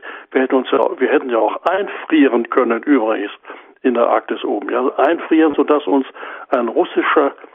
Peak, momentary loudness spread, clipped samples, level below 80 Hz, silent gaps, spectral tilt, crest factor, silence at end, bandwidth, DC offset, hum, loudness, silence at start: 0 dBFS; 7 LU; under 0.1%; -68 dBFS; none; -7 dB/octave; 16 dB; 0.2 s; 3.9 kHz; under 0.1%; none; -16 LUFS; 0.05 s